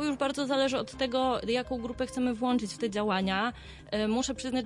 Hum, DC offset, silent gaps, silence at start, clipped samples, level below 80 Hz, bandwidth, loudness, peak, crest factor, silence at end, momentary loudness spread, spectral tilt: none; under 0.1%; none; 0 s; under 0.1%; -54 dBFS; 11.5 kHz; -30 LUFS; -16 dBFS; 14 dB; 0 s; 6 LU; -4.5 dB/octave